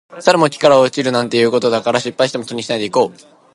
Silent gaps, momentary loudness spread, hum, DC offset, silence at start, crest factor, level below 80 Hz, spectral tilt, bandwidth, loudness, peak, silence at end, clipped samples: none; 9 LU; none; under 0.1%; 0.1 s; 16 dB; -62 dBFS; -4.5 dB/octave; 11.5 kHz; -15 LUFS; 0 dBFS; 0.45 s; under 0.1%